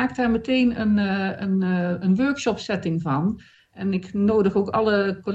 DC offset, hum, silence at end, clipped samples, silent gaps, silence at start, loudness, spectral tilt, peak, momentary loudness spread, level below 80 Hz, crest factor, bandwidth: under 0.1%; none; 0 s; under 0.1%; none; 0 s; -22 LUFS; -7 dB/octave; -8 dBFS; 6 LU; -52 dBFS; 14 dB; 8 kHz